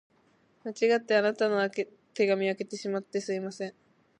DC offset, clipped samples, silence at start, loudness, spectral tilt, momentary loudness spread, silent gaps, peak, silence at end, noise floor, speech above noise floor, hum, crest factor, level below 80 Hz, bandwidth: under 0.1%; under 0.1%; 0.65 s; -29 LUFS; -5 dB/octave; 14 LU; none; -12 dBFS; 0.5 s; -66 dBFS; 38 dB; none; 18 dB; -82 dBFS; 10.5 kHz